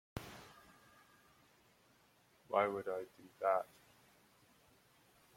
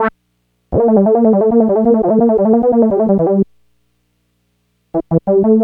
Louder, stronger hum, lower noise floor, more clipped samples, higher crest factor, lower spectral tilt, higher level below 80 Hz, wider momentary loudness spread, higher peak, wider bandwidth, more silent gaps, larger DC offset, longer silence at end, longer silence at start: second, -39 LUFS vs -13 LUFS; second, none vs 60 Hz at -40 dBFS; first, -71 dBFS vs -64 dBFS; neither; first, 26 dB vs 14 dB; second, -5.5 dB/octave vs -12 dB/octave; second, -72 dBFS vs -40 dBFS; first, 23 LU vs 9 LU; second, -18 dBFS vs 0 dBFS; first, 16.5 kHz vs 3 kHz; neither; neither; first, 1.7 s vs 0 s; first, 0.15 s vs 0 s